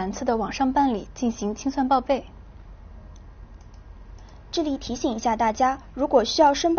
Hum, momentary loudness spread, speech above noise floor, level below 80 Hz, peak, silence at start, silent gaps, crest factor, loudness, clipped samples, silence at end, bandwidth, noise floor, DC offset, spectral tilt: none; 9 LU; 21 dB; -44 dBFS; -6 dBFS; 0 s; none; 18 dB; -24 LUFS; under 0.1%; 0 s; 6.8 kHz; -44 dBFS; under 0.1%; -3.5 dB/octave